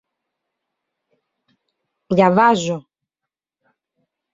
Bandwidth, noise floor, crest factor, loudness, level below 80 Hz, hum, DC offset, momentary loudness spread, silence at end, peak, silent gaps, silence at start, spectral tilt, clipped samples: 7.8 kHz; -86 dBFS; 20 dB; -16 LUFS; -62 dBFS; none; under 0.1%; 13 LU; 1.55 s; -2 dBFS; none; 2.1 s; -6 dB/octave; under 0.1%